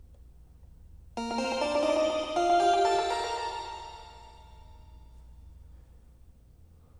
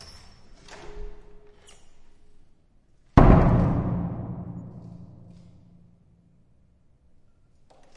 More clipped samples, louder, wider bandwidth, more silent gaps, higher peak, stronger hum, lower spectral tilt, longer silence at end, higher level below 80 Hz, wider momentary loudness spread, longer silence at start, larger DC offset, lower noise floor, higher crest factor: neither; second, -28 LUFS vs -22 LUFS; first, 12 kHz vs 7.6 kHz; neither; second, -14 dBFS vs 0 dBFS; neither; second, -3.5 dB/octave vs -9.5 dB/octave; second, 0 s vs 2.9 s; second, -54 dBFS vs -32 dBFS; second, 21 LU vs 30 LU; second, 0.05 s vs 0.7 s; neither; about the same, -56 dBFS vs -59 dBFS; second, 18 dB vs 26 dB